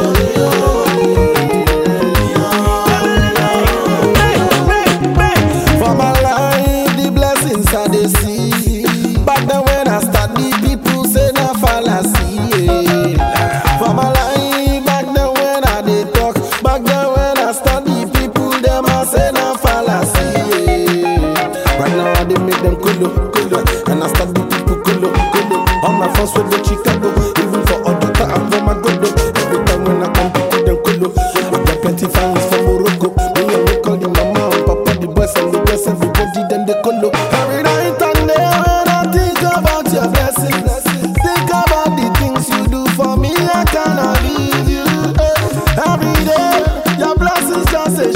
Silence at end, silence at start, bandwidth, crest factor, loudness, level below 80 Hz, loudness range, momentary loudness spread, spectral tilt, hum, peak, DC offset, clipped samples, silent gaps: 0 s; 0 s; 16.5 kHz; 12 dB; -13 LUFS; -20 dBFS; 2 LU; 3 LU; -5 dB/octave; none; 0 dBFS; under 0.1%; under 0.1%; none